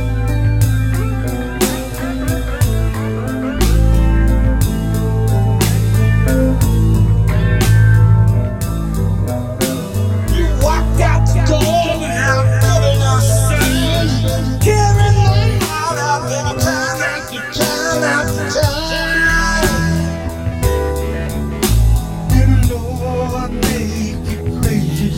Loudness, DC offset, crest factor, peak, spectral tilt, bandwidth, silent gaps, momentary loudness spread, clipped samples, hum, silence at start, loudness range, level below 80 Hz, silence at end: -15 LUFS; 0.2%; 14 dB; 0 dBFS; -5.5 dB/octave; 17 kHz; none; 8 LU; under 0.1%; none; 0 s; 4 LU; -20 dBFS; 0 s